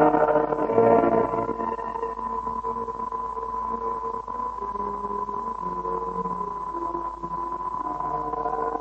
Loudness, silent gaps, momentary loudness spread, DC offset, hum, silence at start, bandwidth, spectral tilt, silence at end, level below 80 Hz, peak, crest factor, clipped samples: -27 LUFS; none; 10 LU; under 0.1%; none; 0 s; 8.2 kHz; -8.5 dB/octave; 0 s; -50 dBFS; -6 dBFS; 20 dB; under 0.1%